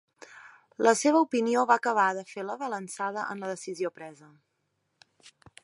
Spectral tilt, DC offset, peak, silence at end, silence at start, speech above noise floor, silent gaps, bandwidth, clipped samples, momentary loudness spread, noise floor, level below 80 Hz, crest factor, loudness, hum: -3.5 dB/octave; under 0.1%; -6 dBFS; 0.35 s; 0.3 s; 50 dB; none; 11.5 kHz; under 0.1%; 23 LU; -78 dBFS; -80 dBFS; 22 dB; -27 LUFS; none